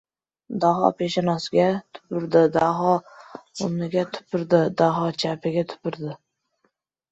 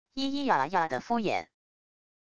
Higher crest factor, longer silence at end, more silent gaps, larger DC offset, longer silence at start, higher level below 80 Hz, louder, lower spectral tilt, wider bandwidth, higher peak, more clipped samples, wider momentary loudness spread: about the same, 20 dB vs 20 dB; first, 0.95 s vs 0.65 s; neither; neither; first, 0.5 s vs 0.05 s; about the same, -64 dBFS vs -64 dBFS; first, -23 LUFS vs -29 LUFS; first, -6.5 dB/octave vs -5 dB/octave; second, 8.2 kHz vs 9.8 kHz; first, -2 dBFS vs -12 dBFS; neither; first, 15 LU vs 6 LU